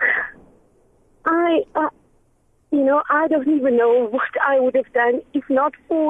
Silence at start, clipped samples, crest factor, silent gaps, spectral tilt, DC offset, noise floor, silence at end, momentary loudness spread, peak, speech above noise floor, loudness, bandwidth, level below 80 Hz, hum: 0 s; under 0.1%; 14 dB; none; -6.5 dB/octave; under 0.1%; -60 dBFS; 0 s; 7 LU; -6 dBFS; 42 dB; -19 LUFS; 3.8 kHz; -62 dBFS; none